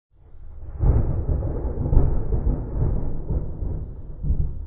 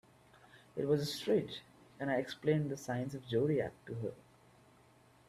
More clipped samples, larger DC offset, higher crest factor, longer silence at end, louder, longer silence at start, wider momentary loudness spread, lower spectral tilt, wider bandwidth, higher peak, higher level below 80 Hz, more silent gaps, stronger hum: neither; neither; about the same, 20 dB vs 18 dB; second, 0 s vs 1.1 s; first, -26 LUFS vs -37 LUFS; second, 0.35 s vs 0.55 s; about the same, 12 LU vs 10 LU; first, -14.5 dB/octave vs -6.5 dB/octave; second, 2.2 kHz vs 14.5 kHz; first, -2 dBFS vs -20 dBFS; first, -24 dBFS vs -72 dBFS; neither; neither